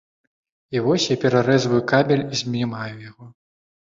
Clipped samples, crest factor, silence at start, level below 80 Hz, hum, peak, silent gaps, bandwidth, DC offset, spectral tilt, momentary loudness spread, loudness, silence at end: under 0.1%; 18 dB; 0.7 s; -58 dBFS; none; -4 dBFS; none; 7.8 kHz; under 0.1%; -5.5 dB/octave; 12 LU; -20 LUFS; 0.55 s